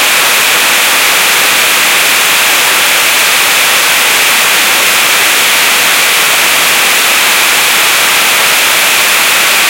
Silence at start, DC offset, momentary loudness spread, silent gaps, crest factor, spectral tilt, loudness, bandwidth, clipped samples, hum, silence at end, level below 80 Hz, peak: 0 s; under 0.1%; 0 LU; none; 8 dB; 1.5 dB/octave; -5 LUFS; over 20 kHz; 0.5%; none; 0 s; -54 dBFS; 0 dBFS